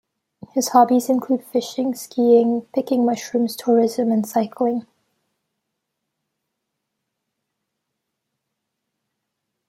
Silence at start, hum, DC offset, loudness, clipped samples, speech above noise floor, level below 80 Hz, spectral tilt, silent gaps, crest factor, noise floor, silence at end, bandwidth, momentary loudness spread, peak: 0.55 s; none; under 0.1%; -20 LUFS; under 0.1%; 60 dB; -72 dBFS; -5 dB/octave; none; 20 dB; -79 dBFS; 4.9 s; 16 kHz; 9 LU; -2 dBFS